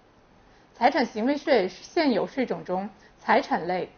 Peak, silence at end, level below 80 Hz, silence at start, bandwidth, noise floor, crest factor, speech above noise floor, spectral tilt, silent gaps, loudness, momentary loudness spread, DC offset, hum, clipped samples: -8 dBFS; 0.1 s; -62 dBFS; 0.8 s; 6.8 kHz; -57 dBFS; 18 dB; 32 dB; -3 dB/octave; none; -25 LUFS; 9 LU; under 0.1%; none; under 0.1%